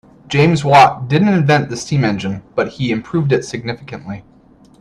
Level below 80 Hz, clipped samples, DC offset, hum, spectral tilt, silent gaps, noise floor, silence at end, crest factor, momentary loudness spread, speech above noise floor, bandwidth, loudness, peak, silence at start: -48 dBFS; under 0.1%; under 0.1%; none; -6 dB/octave; none; -47 dBFS; 0.6 s; 16 dB; 18 LU; 32 dB; 11 kHz; -15 LUFS; 0 dBFS; 0.3 s